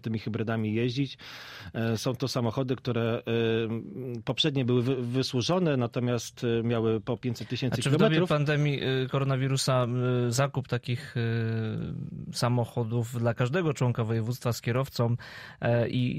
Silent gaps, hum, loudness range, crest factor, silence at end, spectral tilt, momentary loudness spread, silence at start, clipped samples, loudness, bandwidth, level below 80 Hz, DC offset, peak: none; none; 4 LU; 18 dB; 0 s; -6 dB/octave; 8 LU; 0.05 s; under 0.1%; -28 LUFS; 15.5 kHz; -60 dBFS; under 0.1%; -10 dBFS